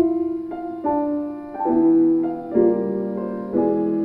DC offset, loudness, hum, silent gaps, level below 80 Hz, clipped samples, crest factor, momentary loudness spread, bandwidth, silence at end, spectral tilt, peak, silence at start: under 0.1%; -21 LUFS; none; none; -56 dBFS; under 0.1%; 14 dB; 10 LU; 2.6 kHz; 0 s; -11.5 dB/octave; -6 dBFS; 0 s